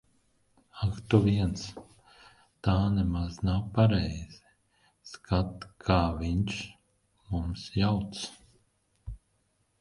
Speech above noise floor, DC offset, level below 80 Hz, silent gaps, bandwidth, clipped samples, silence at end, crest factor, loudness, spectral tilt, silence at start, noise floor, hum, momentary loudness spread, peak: 45 dB; under 0.1%; -42 dBFS; none; 11.5 kHz; under 0.1%; 0.65 s; 22 dB; -29 LUFS; -7 dB/octave; 0.75 s; -73 dBFS; none; 22 LU; -8 dBFS